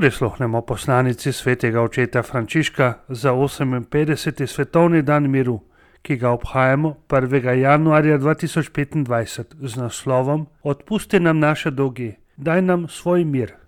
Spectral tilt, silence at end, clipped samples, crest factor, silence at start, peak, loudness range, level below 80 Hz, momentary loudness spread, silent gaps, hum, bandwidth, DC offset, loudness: -6.5 dB/octave; 0.15 s; under 0.1%; 18 dB; 0 s; -2 dBFS; 3 LU; -46 dBFS; 9 LU; none; none; 16 kHz; under 0.1%; -19 LUFS